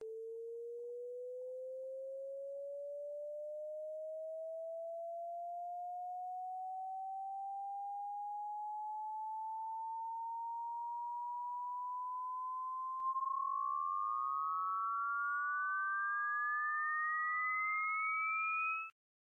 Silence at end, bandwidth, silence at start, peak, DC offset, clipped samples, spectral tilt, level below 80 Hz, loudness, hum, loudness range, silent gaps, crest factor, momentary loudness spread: 0.4 s; 11.5 kHz; 0 s; -30 dBFS; under 0.1%; under 0.1%; -1 dB/octave; under -90 dBFS; -40 LUFS; none; 10 LU; none; 10 dB; 11 LU